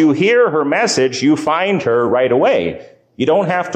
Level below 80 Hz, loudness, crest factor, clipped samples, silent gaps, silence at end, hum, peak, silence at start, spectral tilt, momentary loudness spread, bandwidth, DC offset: -54 dBFS; -14 LUFS; 10 dB; under 0.1%; none; 0 s; none; -4 dBFS; 0 s; -5 dB/octave; 5 LU; 9.6 kHz; under 0.1%